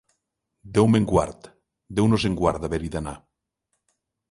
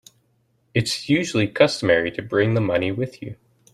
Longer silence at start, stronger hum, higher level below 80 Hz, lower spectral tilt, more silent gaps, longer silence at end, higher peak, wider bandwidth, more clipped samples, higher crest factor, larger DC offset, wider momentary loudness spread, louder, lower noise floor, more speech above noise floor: about the same, 0.65 s vs 0.75 s; neither; first, -42 dBFS vs -56 dBFS; first, -7 dB/octave vs -5.5 dB/octave; neither; first, 1.15 s vs 0.4 s; about the same, -4 dBFS vs -2 dBFS; second, 11.5 kHz vs 13.5 kHz; neither; about the same, 20 dB vs 20 dB; neither; first, 14 LU vs 10 LU; about the same, -23 LUFS vs -21 LUFS; first, -79 dBFS vs -65 dBFS; first, 57 dB vs 45 dB